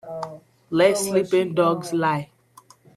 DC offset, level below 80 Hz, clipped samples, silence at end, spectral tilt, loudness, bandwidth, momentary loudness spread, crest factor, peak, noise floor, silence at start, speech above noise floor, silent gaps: under 0.1%; -66 dBFS; under 0.1%; 0.7 s; -5 dB/octave; -21 LUFS; 14 kHz; 15 LU; 18 dB; -4 dBFS; -53 dBFS; 0.05 s; 32 dB; none